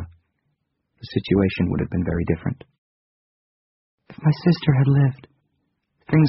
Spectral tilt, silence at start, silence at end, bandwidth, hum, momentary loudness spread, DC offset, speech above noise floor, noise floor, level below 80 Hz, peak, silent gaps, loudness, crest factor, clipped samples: -7.5 dB/octave; 0 s; 0 s; 5.8 kHz; none; 12 LU; under 0.1%; 54 dB; -73 dBFS; -46 dBFS; -4 dBFS; 2.78-3.98 s; -21 LUFS; 18 dB; under 0.1%